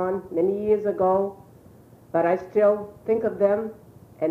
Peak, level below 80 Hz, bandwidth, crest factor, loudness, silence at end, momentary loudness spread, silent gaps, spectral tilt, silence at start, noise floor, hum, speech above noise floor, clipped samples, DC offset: -8 dBFS; -60 dBFS; 6 kHz; 16 dB; -24 LUFS; 0 s; 7 LU; none; -9 dB/octave; 0 s; -50 dBFS; none; 27 dB; under 0.1%; under 0.1%